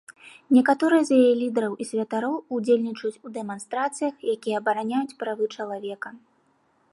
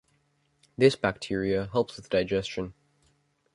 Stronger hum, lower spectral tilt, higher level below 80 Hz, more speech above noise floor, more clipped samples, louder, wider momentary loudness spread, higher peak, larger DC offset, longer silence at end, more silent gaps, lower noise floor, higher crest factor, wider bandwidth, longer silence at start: neither; about the same, -5 dB/octave vs -6 dB/octave; second, -80 dBFS vs -56 dBFS; about the same, 42 dB vs 44 dB; neither; first, -24 LUFS vs -27 LUFS; about the same, 14 LU vs 13 LU; about the same, -8 dBFS vs -6 dBFS; neither; about the same, 0.75 s vs 0.85 s; neither; second, -65 dBFS vs -70 dBFS; second, 18 dB vs 24 dB; about the same, 11.5 kHz vs 11.5 kHz; second, 0.1 s vs 0.8 s